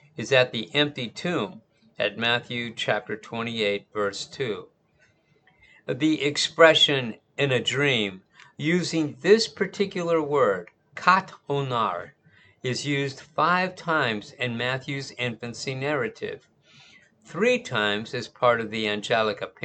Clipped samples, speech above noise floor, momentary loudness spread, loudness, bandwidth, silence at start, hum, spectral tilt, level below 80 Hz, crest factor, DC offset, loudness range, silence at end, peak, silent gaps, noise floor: under 0.1%; 39 dB; 12 LU; -24 LUFS; 9.2 kHz; 0.2 s; none; -4 dB/octave; -68 dBFS; 24 dB; under 0.1%; 7 LU; 0.15 s; -2 dBFS; none; -64 dBFS